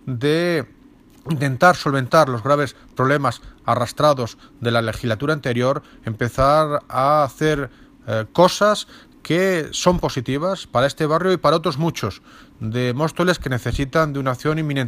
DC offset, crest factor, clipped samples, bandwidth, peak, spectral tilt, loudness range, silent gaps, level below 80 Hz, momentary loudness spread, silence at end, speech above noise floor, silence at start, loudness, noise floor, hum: under 0.1%; 18 dB; under 0.1%; 15.5 kHz; -2 dBFS; -5.5 dB/octave; 2 LU; none; -42 dBFS; 11 LU; 0 s; 28 dB; 0.05 s; -20 LUFS; -47 dBFS; none